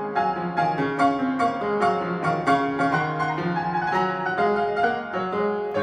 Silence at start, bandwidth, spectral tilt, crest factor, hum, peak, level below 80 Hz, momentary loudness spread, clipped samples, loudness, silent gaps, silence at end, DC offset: 0 s; 10.5 kHz; -7 dB/octave; 16 dB; none; -8 dBFS; -58 dBFS; 3 LU; under 0.1%; -23 LUFS; none; 0 s; under 0.1%